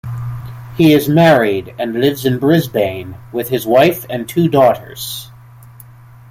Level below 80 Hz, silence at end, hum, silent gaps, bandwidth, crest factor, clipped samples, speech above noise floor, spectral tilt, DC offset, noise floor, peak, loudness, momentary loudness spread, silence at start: -46 dBFS; 0.45 s; none; none; 16.5 kHz; 14 dB; under 0.1%; 26 dB; -6 dB/octave; under 0.1%; -39 dBFS; 0 dBFS; -14 LUFS; 15 LU; 0.05 s